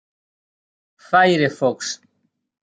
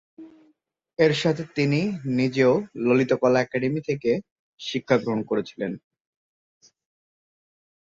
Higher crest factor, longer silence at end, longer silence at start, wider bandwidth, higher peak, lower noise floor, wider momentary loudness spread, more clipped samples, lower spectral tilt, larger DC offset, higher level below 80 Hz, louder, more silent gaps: about the same, 20 dB vs 20 dB; second, 0.7 s vs 2.15 s; first, 1.1 s vs 0.2 s; first, 9.4 kHz vs 7.8 kHz; about the same, -2 dBFS vs -4 dBFS; first, -70 dBFS vs -65 dBFS; about the same, 13 LU vs 11 LU; neither; second, -4.5 dB/octave vs -6.5 dB/octave; neither; second, -70 dBFS vs -64 dBFS; first, -18 LUFS vs -23 LUFS; second, none vs 4.31-4.58 s